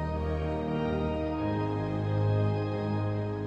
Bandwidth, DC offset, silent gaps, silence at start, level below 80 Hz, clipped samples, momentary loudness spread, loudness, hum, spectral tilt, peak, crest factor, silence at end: 6 kHz; under 0.1%; none; 0 s; -44 dBFS; under 0.1%; 4 LU; -31 LUFS; none; -9.5 dB/octave; -18 dBFS; 12 dB; 0 s